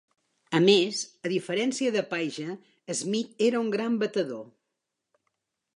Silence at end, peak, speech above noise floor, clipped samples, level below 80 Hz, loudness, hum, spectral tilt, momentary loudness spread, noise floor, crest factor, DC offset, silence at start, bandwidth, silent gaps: 1.25 s; -8 dBFS; 57 dB; under 0.1%; -82 dBFS; -27 LUFS; none; -4 dB/octave; 13 LU; -84 dBFS; 22 dB; under 0.1%; 0.5 s; 11 kHz; none